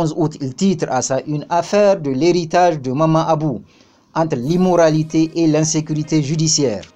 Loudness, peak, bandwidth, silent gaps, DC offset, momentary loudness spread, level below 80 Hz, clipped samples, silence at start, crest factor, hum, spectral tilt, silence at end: -17 LUFS; -2 dBFS; 9.4 kHz; none; under 0.1%; 6 LU; -50 dBFS; under 0.1%; 0 s; 14 dB; none; -5.5 dB/octave; 0.1 s